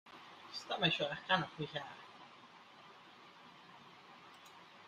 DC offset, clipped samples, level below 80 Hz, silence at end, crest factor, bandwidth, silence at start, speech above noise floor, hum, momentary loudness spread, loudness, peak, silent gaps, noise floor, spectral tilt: under 0.1%; under 0.1%; -78 dBFS; 0 s; 26 dB; 14 kHz; 0.05 s; 21 dB; none; 23 LU; -37 LUFS; -18 dBFS; none; -59 dBFS; -4.5 dB/octave